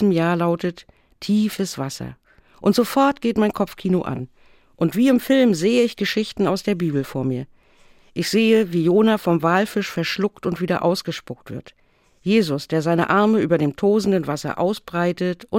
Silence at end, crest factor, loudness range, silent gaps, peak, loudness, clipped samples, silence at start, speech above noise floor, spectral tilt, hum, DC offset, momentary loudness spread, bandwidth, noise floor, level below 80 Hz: 0 s; 16 dB; 3 LU; none; -4 dBFS; -20 LUFS; under 0.1%; 0 s; 33 dB; -6 dB/octave; none; under 0.1%; 13 LU; 17 kHz; -52 dBFS; -56 dBFS